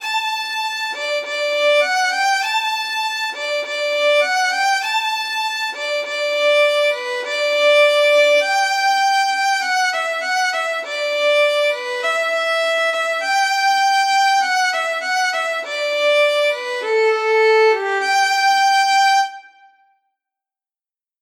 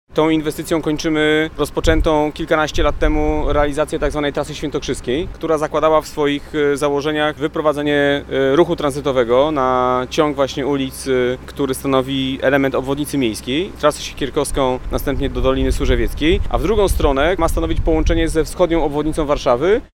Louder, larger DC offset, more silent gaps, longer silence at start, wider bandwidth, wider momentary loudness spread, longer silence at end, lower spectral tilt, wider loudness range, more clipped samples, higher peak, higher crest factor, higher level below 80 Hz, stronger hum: about the same, -17 LUFS vs -18 LUFS; neither; neither; about the same, 0 s vs 0.1 s; about the same, 16.5 kHz vs 17 kHz; about the same, 7 LU vs 6 LU; first, 1.75 s vs 0.1 s; second, 3.5 dB/octave vs -5.5 dB/octave; about the same, 3 LU vs 2 LU; neither; about the same, -4 dBFS vs -2 dBFS; about the same, 14 dB vs 16 dB; second, -88 dBFS vs -26 dBFS; neither